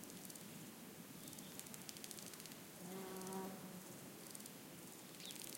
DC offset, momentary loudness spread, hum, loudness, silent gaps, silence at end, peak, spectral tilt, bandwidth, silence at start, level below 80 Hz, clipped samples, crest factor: under 0.1%; 6 LU; none; -52 LUFS; none; 0 s; -24 dBFS; -3 dB/octave; 17 kHz; 0 s; -86 dBFS; under 0.1%; 28 dB